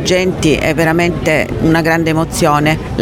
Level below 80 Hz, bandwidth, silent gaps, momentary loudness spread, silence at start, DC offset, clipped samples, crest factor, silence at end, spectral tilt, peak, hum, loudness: -30 dBFS; 17 kHz; none; 2 LU; 0 s; under 0.1%; under 0.1%; 12 dB; 0 s; -5.5 dB/octave; 0 dBFS; none; -13 LUFS